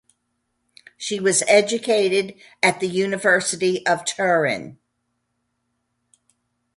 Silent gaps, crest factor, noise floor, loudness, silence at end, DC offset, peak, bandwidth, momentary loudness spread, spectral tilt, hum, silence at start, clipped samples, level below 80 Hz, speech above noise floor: none; 22 dB; -74 dBFS; -20 LUFS; 2.05 s; under 0.1%; -2 dBFS; 11.5 kHz; 11 LU; -3 dB/octave; none; 1 s; under 0.1%; -68 dBFS; 54 dB